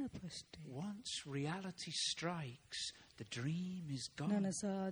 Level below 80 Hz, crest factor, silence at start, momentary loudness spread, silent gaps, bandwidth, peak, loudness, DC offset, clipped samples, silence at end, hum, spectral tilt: -74 dBFS; 18 dB; 0 s; 11 LU; none; over 20 kHz; -26 dBFS; -43 LUFS; under 0.1%; under 0.1%; 0 s; none; -4 dB/octave